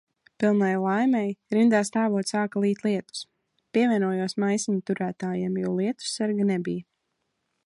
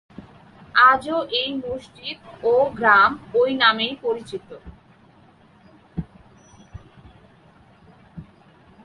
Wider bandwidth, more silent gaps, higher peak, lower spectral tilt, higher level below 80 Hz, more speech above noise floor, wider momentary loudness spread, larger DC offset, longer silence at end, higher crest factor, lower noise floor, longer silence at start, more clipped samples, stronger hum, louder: about the same, 11.5 kHz vs 11 kHz; neither; second, -10 dBFS vs -2 dBFS; about the same, -5.5 dB/octave vs -5 dB/octave; second, -72 dBFS vs -52 dBFS; first, 53 dB vs 33 dB; second, 7 LU vs 20 LU; neither; first, 0.85 s vs 0.6 s; second, 16 dB vs 22 dB; first, -77 dBFS vs -53 dBFS; first, 0.4 s vs 0.2 s; neither; neither; second, -25 LUFS vs -19 LUFS